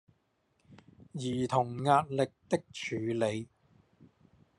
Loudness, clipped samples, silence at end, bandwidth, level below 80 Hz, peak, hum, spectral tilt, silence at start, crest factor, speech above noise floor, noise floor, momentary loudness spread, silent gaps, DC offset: -32 LUFS; under 0.1%; 1.15 s; 11.5 kHz; -70 dBFS; -12 dBFS; none; -6 dB/octave; 0.7 s; 22 dB; 44 dB; -75 dBFS; 13 LU; none; under 0.1%